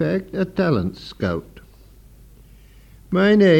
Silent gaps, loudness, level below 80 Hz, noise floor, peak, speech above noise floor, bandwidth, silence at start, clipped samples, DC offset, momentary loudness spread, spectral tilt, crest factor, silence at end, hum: none; -21 LUFS; -48 dBFS; -47 dBFS; -4 dBFS; 29 dB; 8.4 kHz; 0 s; under 0.1%; under 0.1%; 11 LU; -8 dB/octave; 16 dB; 0 s; none